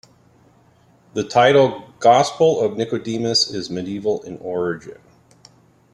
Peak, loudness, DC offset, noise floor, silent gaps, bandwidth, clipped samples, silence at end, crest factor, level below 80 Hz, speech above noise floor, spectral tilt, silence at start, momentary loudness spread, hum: -2 dBFS; -18 LUFS; under 0.1%; -54 dBFS; none; 12 kHz; under 0.1%; 1 s; 18 dB; -60 dBFS; 36 dB; -4.5 dB/octave; 1.15 s; 13 LU; none